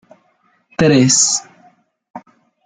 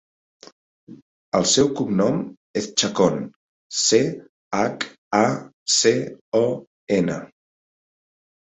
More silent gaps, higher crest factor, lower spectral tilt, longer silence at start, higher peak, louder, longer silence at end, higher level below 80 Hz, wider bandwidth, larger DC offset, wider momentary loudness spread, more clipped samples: second, 2.10-2.14 s vs 1.02-1.32 s, 2.37-2.54 s, 3.36-3.70 s, 4.29-4.51 s, 4.98-5.11 s, 5.53-5.66 s, 6.21-6.32 s, 6.67-6.87 s; about the same, 18 dB vs 20 dB; about the same, -3.5 dB/octave vs -3.5 dB/octave; about the same, 0.8 s vs 0.9 s; first, 0 dBFS vs -4 dBFS; first, -12 LUFS vs -21 LUFS; second, 0.45 s vs 1.2 s; first, -50 dBFS vs -60 dBFS; first, 10 kHz vs 8.4 kHz; neither; about the same, 11 LU vs 11 LU; neither